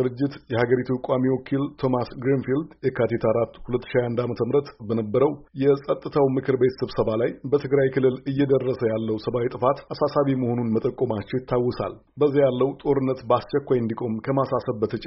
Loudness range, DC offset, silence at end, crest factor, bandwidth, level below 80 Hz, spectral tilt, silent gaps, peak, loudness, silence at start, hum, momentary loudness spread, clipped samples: 2 LU; under 0.1%; 0 s; 16 dB; 5.8 kHz; -52 dBFS; -7 dB/octave; none; -6 dBFS; -24 LUFS; 0 s; none; 5 LU; under 0.1%